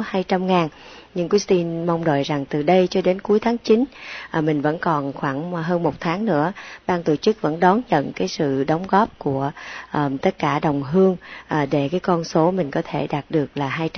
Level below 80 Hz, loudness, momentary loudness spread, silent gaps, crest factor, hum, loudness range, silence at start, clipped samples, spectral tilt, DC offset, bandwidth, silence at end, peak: -54 dBFS; -21 LUFS; 7 LU; none; 20 dB; none; 2 LU; 0 s; under 0.1%; -6.5 dB/octave; under 0.1%; 6.6 kHz; 0 s; -2 dBFS